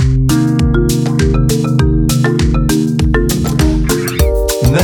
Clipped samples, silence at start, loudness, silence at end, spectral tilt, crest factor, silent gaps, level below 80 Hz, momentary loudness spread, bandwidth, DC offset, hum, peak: under 0.1%; 0 s; -13 LUFS; 0 s; -6 dB/octave; 12 dB; none; -18 dBFS; 2 LU; 18.5 kHz; under 0.1%; none; 0 dBFS